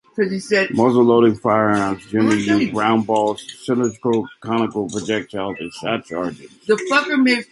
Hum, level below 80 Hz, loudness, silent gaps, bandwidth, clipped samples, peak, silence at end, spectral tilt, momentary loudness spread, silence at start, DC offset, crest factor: none; -56 dBFS; -19 LUFS; none; 11.5 kHz; under 0.1%; -2 dBFS; 0.1 s; -5.5 dB/octave; 11 LU; 0.15 s; under 0.1%; 16 dB